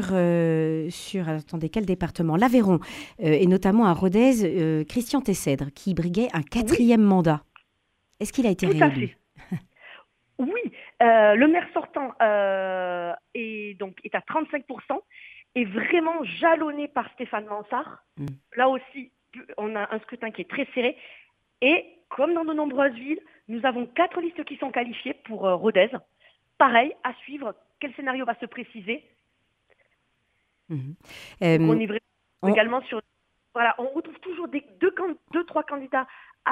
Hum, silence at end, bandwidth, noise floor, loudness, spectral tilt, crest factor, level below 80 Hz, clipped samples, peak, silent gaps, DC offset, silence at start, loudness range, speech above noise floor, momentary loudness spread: none; 0 s; 15.5 kHz; -72 dBFS; -24 LUFS; -6.5 dB/octave; 20 dB; -54 dBFS; under 0.1%; -4 dBFS; none; under 0.1%; 0 s; 8 LU; 48 dB; 16 LU